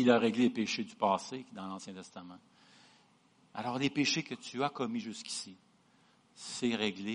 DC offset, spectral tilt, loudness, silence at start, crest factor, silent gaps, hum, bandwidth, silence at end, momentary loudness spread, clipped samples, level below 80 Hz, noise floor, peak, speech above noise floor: under 0.1%; -4 dB/octave; -34 LUFS; 0 s; 22 dB; none; none; 10.5 kHz; 0 s; 18 LU; under 0.1%; -78 dBFS; -67 dBFS; -14 dBFS; 33 dB